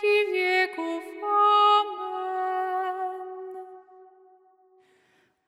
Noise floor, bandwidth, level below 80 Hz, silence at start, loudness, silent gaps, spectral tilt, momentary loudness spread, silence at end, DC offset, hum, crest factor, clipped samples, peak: -66 dBFS; 12.5 kHz; under -90 dBFS; 0 s; -24 LUFS; none; -1 dB/octave; 19 LU; 1.45 s; under 0.1%; none; 16 dB; under 0.1%; -12 dBFS